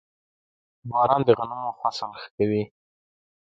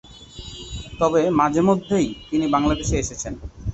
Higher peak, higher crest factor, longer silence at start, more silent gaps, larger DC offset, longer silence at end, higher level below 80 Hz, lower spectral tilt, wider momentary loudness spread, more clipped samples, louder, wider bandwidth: about the same, -4 dBFS vs -6 dBFS; first, 22 dB vs 16 dB; first, 0.85 s vs 0.05 s; first, 2.31-2.38 s vs none; neither; first, 0.95 s vs 0 s; second, -64 dBFS vs -36 dBFS; first, -7 dB/octave vs -5.5 dB/octave; about the same, 15 LU vs 17 LU; neither; second, -24 LUFS vs -21 LUFS; about the same, 7.8 kHz vs 8.2 kHz